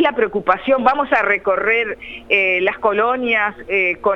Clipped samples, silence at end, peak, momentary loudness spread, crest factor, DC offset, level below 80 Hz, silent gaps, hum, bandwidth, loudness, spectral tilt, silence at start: under 0.1%; 0 s; 0 dBFS; 3 LU; 16 dB; under 0.1%; -50 dBFS; none; none; 6.8 kHz; -16 LUFS; -6 dB/octave; 0 s